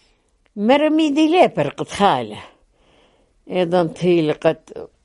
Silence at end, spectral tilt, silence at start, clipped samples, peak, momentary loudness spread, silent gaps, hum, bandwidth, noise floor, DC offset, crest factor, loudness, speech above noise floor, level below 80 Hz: 0.2 s; -6 dB/octave; 0.55 s; under 0.1%; -2 dBFS; 16 LU; none; none; 11.5 kHz; -60 dBFS; under 0.1%; 18 dB; -18 LUFS; 43 dB; -56 dBFS